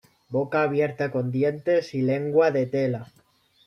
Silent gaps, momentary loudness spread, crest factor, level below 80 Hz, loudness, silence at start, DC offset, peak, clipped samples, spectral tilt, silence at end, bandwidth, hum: none; 7 LU; 16 dB; -68 dBFS; -24 LUFS; 0.3 s; under 0.1%; -8 dBFS; under 0.1%; -8 dB/octave; 0.6 s; 10 kHz; none